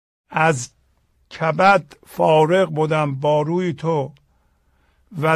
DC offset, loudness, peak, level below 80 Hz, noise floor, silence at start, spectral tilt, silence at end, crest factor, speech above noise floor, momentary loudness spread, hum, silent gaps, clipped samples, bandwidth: under 0.1%; -19 LUFS; -2 dBFS; -60 dBFS; -61 dBFS; 0.3 s; -6 dB/octave; 0 s; 16 dB; 43 dB; 17 LU; none; none; under 0.1%; 14.5 kHz